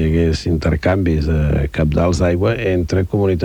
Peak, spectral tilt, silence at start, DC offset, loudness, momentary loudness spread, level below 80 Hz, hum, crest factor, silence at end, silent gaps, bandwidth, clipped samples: -2 dBFS; -7.5 dB/octave; 0 s; under 0.1%; -17 LUFS; 2 LU; -24 dBFS; none; 14 dB; 0 s; none; 10 kHz; under 0.1%